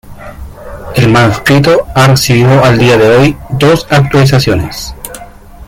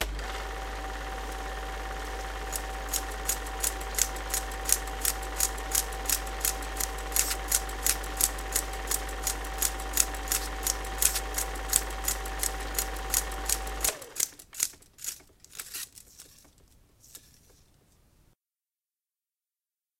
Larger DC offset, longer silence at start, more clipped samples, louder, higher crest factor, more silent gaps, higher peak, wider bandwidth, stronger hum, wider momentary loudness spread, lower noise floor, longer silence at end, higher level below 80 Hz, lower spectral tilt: neither; about the same, 0.05 s vs 0 s; neither; first, -7 LUFS vs -30 LUFS; second, 8 dB vs 32 dB; neither; about the same, 0 dBFS vs 0 dBFS; about the same, 16.5 kHz vs 17 kHz; neither; first, 20 LU vs 11 LU; second, -30 dBFS vs under -90 dBFS; second, 0.05 s vs 2.8 s; first, -30 dBFS vs -40 dBFS; first, -5.5 dB/octave vs -1 dB/octave